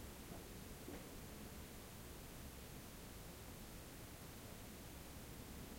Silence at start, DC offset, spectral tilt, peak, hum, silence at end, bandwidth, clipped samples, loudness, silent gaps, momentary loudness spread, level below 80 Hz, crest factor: 0 s; under 0.1%; -4 dB/octave; -40 dBFS; none; 0 s; 16.5 kHz; under 0.1%; -55 LUFS; none; 1 LU; -60 dBFS; 14 dB